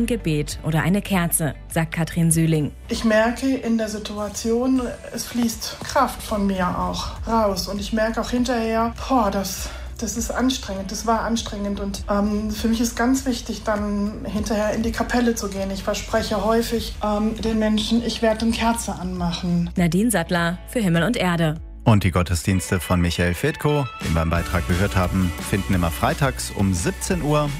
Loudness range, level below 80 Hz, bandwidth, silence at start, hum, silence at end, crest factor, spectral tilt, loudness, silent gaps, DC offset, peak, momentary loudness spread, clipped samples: 3 LU; -36 dBFS; 16 kHz; 0 s; none; 0 s; 18 dB; -5 dB/octave; -22 LUFS; none; under 0.1%; -4 dBFS; 6 LU; under 0.1%